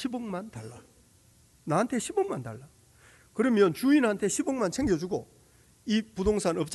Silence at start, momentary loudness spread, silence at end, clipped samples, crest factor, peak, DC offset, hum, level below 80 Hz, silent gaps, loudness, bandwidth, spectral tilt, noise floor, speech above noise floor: 0 s; 19 LU; 0 s; under 0.1%; 18 dB; -10 dBFS; under 0.1%; none; -52 dBFS; none; -28 LUFS; 12 kHz; -5 dB/octave; -61 dBFS; 33 dB